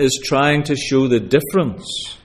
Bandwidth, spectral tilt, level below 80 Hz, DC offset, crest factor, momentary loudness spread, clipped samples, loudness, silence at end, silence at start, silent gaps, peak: 16 kHz; -5 dB/octave; -48 dBFS; under 0.1%; 16 dB; 8 LU; under 0.1%; -17 LUFS; 0.1 s; 0 s; none; -2 dBFS